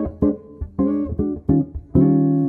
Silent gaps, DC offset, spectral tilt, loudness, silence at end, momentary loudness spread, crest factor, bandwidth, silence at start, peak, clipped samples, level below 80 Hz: none; under 0.1%; -14 dB/octave; -20 LUFS; 0 s; 8 LU; 16 dB; 2.3 kHz; 0 s; -4 dBFS; under 0.1%; -34 dBFS